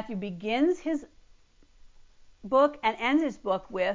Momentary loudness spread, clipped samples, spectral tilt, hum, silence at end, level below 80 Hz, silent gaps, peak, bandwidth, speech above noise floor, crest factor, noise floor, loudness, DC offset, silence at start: 10 LU; under 0.1%; -6 dB/octave; none; 0 s; -60 dBFS; none; -12 dBFS; 7.6 kHz; 31 dB; 16 dB; -58 dBFS; -27 LUFS; under 0.1%; 0 s